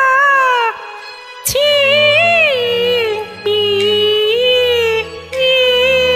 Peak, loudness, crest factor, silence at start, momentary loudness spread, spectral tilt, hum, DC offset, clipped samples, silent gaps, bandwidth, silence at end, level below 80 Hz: -2 dBFS; -12 LUFS; 12 dB; 0 s; 11 LU; -1.5 dB/octave; none; under 0.1%; under 0.1%; none; 16 kHz; 0 s; -46 dBFS